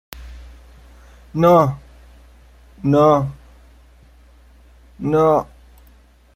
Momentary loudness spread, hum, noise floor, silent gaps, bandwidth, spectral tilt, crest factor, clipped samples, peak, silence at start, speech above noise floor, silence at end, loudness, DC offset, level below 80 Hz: 24 LU; none; -50 dBFS; none; 16.5 kHz; -8.5 dB/octave; 18 dB; under 0.1%; -2 dBFS; 0.15 s; 35 dB; 0.9 s; -17 LUFS; under 0.1%; -44 dBFS